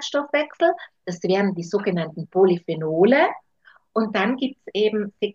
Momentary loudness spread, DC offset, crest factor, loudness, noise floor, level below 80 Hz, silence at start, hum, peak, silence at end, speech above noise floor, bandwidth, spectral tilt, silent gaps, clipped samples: 10 LU; under 0.1%; 16 dB; -22 LUFS; -56 dBFS; -72 dBFS; 0 s; none; -4 dBFS; 0.05 s; 35 dB; 7.6 kHz; -6 dB/octave; none; under 0.1%